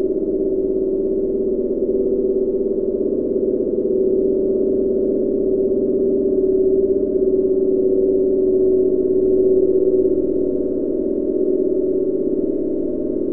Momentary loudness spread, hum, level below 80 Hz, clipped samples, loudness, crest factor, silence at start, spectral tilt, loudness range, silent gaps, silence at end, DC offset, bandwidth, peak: 4 LU; none; -40 dBFS; under 0.1%; -18 LUFS; 10 dB; 0 s; -14.5 dB/octave; 3 LU; none; 0 s; under 0.1%; 1.3 kHz; -6 dBFS